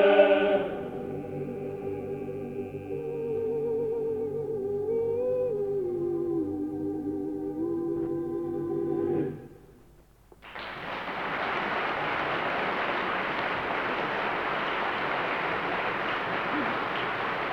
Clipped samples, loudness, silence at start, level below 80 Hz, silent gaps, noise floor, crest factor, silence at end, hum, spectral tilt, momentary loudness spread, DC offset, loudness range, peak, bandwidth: under 0.1%; -30 LUFS; 0 s; -60 dBFS; none; -56 dBFS; 24 dB; 0 s; none; -6.5 dB/octave; 7 LU; under 0.1%; 4 LU; -6 dBFS; 18.5 kHz